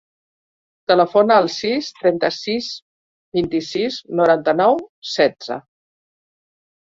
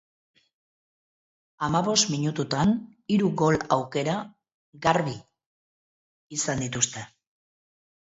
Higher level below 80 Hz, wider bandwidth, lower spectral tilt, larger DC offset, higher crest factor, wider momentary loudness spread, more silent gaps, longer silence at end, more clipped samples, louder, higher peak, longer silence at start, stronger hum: about the same, -60 dBFS vs -58 dBFS; about the same, 7.8 kHz vs 8 kHz; about the same, -5 dB/octave vs -4 dB/octave; neither; about the same, 18 dB vs 22 dB; first, 15 LU vs 11 LU; second, 2.82-3.32 s, 4.89-5.02 s vs 4.54-4.73 s, 5.46-6.29 s; first, 1.25 s vs 0.95 s; neither; first, -18 LUFS vs -25 LUFS; first, -2 dBFS vs -6 dBFS; second, 0.9 s vs 1.6 s; neither